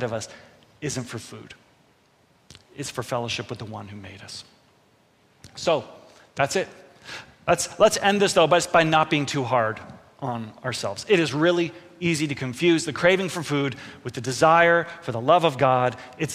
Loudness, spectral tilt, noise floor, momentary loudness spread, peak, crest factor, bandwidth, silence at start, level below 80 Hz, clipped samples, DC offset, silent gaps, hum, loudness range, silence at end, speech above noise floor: -22 LUFS; -4.5 dB/octave; -61 dBFS; 19 LU; -4 dBFS; 20 dB; 15.5 kHz; 0 s; -60 dBFS; under 0.1%; under 0.1%; none; none; 13 LU; 0 s; 38 dB